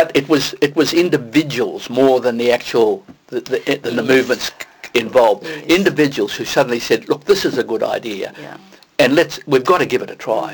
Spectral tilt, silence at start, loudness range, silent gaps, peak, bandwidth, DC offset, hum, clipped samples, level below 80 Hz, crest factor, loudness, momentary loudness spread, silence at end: -4.5 dB/octave; 0 s; 2 LU; none; -2 dBFS; 19.5 kHz; under 0.1%; none; under 0.1%; -54 dBFS; 14 dB; -16 LUFS; 11 LU; 0 s